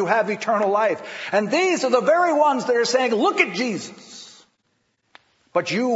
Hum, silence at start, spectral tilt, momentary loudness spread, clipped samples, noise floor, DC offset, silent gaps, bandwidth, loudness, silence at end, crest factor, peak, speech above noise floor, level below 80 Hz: none; 0 s; -4 dB/octave; 12 LU; under 0.1%; -70 dBFS; under 0.1%; none; 8 kHz; -20 LUFS; 0 s; 18 dB; -4 dBFS; 50 dB; -80 dBFS